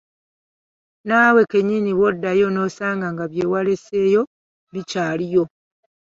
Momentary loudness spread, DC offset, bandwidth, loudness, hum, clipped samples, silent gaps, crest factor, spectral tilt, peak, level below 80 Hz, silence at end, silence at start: 14 LU; under 0.1%; 7.6 kHz; -19 LUFS; none; under 0.1%; 4.27-4.67 s; 18 dB; -6.5 dB/octave; -2 dBFS; -60 dBFS; 0.65 s; 1.05 s